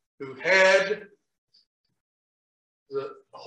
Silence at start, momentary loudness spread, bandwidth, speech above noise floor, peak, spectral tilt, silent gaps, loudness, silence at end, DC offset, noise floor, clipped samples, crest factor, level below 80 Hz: 0.2 s; 21 LU; 9 kHz; over 67 dB; -8 dBFS; -2.5 dB/octave; 1.38-1.48 s, 1.67-1.84 s, 2.00-2.86 s; -22 LUFS; 0 s; under 0.1%; under -90 dBFS; under 0.1%; 20 dB; -82 dBFS